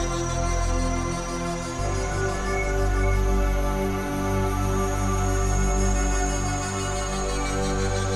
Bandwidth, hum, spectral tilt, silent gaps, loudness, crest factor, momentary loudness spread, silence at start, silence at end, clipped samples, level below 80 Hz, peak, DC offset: 13 kHz; none; -5 dB/octave; none; -26 LUFS; 12 dB; 4 LU; 0 s; 0 s; under 0.1%; -28 dBFS; -12 dBFS; under 0.1%